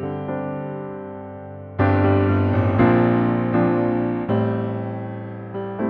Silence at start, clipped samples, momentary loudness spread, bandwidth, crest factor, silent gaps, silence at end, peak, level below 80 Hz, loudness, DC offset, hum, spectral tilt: 0 s; under 0.1%; 16 LU; 4.5 kHz; 16 dB; none; 0 s; -4 dBFS; -48 dBFS; -21 LUFS; under 0.1%; none; -11 dB/octave